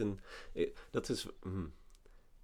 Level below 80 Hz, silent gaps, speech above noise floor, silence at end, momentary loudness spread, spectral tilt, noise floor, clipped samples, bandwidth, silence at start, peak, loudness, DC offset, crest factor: -56 dBFS; none; 20 dB; 0 s; 10 LU; -5.5 dB/octave; -60 dBFS; under 0.1%; 17.5 kHz; 0 s; -20 dBFS; -41 LUFS; under 0.1%; 20 dB